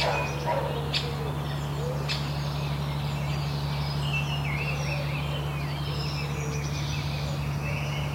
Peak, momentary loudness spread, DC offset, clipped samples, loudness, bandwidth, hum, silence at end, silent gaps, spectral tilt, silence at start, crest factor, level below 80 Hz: -14 dBFS; 3 LU; under 0.1%; under 0.1%; -29 LUFS; 16 kHz; none; 0 s; none; -5.5 dB/octave; 0 s; 16 dB; -40 dBFS